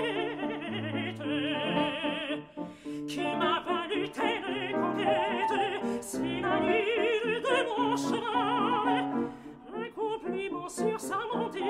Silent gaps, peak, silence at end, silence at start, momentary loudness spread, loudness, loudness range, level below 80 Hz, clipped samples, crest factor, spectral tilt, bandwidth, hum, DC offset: none; -14 dBFS; 0 s; 0 s; 8 LU; -30 LUFS; 3 LU; -64 dBFS; under 0.1%; 16 dB; -4.5 dB/octave; 15 kHz; none; under 0.1%